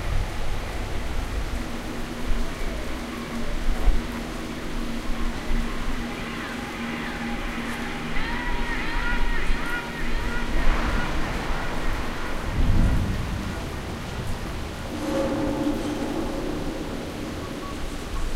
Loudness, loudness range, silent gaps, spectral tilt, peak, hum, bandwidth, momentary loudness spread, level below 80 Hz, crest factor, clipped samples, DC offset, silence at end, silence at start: -29 LUFS; 3 LU; none; -5.5 dB/octave; -6 dBFS; none; 14.5 kHz; 7 LU; -28 dBFS; 18 dB; under 0.1%; under 0.1%; 0 s; 0 s